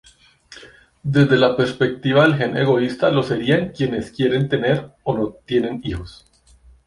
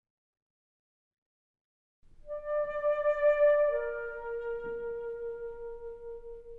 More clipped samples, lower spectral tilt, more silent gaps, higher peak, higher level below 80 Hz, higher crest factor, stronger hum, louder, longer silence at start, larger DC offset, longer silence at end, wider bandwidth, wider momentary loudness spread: neither; first, -7.5 dB/octave vs -5.5 dB/octave; neither; first, -2 dBFS vs -18 dBFS; first, -46 dBFS vs -56 dBFS; about the same, 18 dB vs 16 dB; neither; first, -19 LUFS vs -31 LUFS; second, 0.5 s vs 2.25 s; neither; first, 0.75 s vs 0 s; first, 11 kHz vs 3.8 kHz; second, 10 LU vs 19 LU